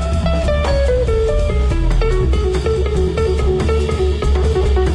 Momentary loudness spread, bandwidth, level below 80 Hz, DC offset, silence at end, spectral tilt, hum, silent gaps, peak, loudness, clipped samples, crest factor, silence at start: 2 LU; 10.5 kHz; -16 dBFS; under 0.1%; 0 s; -7 dB/octave; none; none; -6 dBFS; -17 LUFS; under 0.1%; 10 dB; 0 s